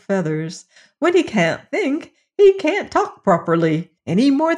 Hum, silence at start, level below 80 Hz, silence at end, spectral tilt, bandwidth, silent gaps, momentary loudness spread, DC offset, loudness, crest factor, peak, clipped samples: none; 0.1 s; -58 dBFS; 0 s; -6.5 dB/octave; 10.5 kHz; none; 12 LU; under 0.1%; -18 LUFS; 14 dB; -4 dBFS; under 0.1%